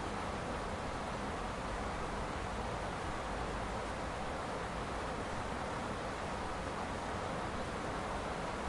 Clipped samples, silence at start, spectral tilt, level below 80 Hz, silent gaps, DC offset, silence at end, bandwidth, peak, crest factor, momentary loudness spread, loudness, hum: under 0.1%; 0 s; -5 dB/octave; -48 dBFS; none; under 0.1%; 0 s; 11.5 kHz; -24 dBFS; 14 dB; 1 LU; -40 LUFS; none